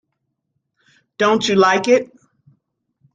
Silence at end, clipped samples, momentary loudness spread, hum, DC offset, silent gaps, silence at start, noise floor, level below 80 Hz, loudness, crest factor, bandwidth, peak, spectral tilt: 1.1 s; under 0.1%; 6 LU; none; under 0.1%; none; 1.2 s; -74 dBFS; -64 dBFS; -16 LUFS; 18 dB; 9.2 kHz; -2 dBFS; -4 dB/octave